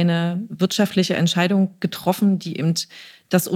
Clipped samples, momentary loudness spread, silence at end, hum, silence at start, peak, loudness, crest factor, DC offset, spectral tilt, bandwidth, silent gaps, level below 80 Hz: under 0.1%; 6 LU; 0 s; none; 0 s; -2 dBFS; -21 LUFS; 18 dB; under 0.1%; -5.5 dB/octave; 16.5 kHz; none; -68 dBFS